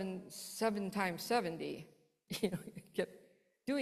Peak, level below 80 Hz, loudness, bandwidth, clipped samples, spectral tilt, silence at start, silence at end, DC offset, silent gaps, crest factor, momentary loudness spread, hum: -20 dBFS; -76 dBFS; -39 LUFS; 14.5 kHz; under 0.1%; -4.5 dB/octave; 0 s; 0 s; under 0.1%; none; 20 dB; 10 LU; none